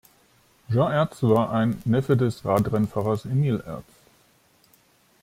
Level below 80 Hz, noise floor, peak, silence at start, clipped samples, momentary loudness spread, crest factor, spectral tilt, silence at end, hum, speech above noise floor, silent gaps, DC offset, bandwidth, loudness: -54 dBFS; -60 dBFS; -6 dBFS; 0.7 s; under 0.1%; 6 LU; 18 dB; -8 dB/octave; 1.4 s; none; 38 dB; none; under 0.1%; 16 kHz; -23 LUFS